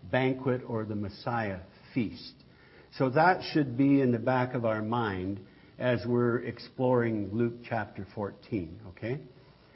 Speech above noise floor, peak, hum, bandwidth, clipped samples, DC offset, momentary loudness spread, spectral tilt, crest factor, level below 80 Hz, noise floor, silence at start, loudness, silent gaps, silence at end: 27 dB; -10 dBFS; none; 5.8 kHz; under 0.1%; under 0.1%; 15 LU; -10.5 dB/octave; 20 dB; -64 dBFS; -56 dBFS; 0 s; -30 LUFS; none; 0.45 s